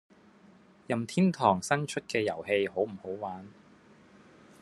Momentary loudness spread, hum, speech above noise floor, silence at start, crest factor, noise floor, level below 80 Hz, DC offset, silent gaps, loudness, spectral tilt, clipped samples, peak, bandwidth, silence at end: 13 LU; none; 29 dB; 0.9 s; 22 dB; -58 dBFS; -72 dBFS; under 0.1%; none; -30 LUFS; -5.5 dB/octave; under 0.1%; -8 dBFS; 12.5 kHz; 1.1 s